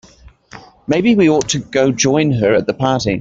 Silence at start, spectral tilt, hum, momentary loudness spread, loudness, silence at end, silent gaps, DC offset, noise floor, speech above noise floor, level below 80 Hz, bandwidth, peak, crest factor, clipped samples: 0.55 s; -5 dB/octave; none; 6 LU; -14 LUFS; 0 s; none; under 0.1%; -44 dBFS; 30 dB; -46 dBFS; 8.2 kHz; -2 dBFS; 14 dB; under 0.1%